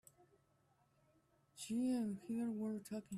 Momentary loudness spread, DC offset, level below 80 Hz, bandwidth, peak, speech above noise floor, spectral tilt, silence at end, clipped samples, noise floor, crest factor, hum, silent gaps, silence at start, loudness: 7 LU; under 0.1%; -82 dBFS; 13.5 kHz; -32 dBFS; 35 dB; -6 dB/octave; 0 s; under 0.1%; -77 dBFS; 14 dB; none; none; 1.55 s; -42 LUFS